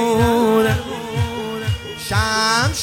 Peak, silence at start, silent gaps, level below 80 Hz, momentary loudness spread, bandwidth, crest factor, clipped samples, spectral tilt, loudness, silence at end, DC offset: -2 dBFS; 0 s; none; -38 dBFS; 9 LU; 17 kHz; 16 dB; under 0.1%; -4.5 dB/octave; -18 LUFS; 0 s; under 0.1%